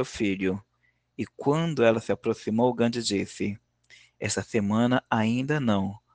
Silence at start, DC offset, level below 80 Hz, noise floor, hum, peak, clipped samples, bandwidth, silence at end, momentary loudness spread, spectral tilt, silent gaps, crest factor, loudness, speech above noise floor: 0 s; under 0.1%; -62 dBFS; -71 dBFS; none; -6 dBFS; under 0.1%; 9.8 kHz; 0.2 s; 11 LU; -5.5 dB/octave; none; 20 dB; -26 LUFS; 45 dB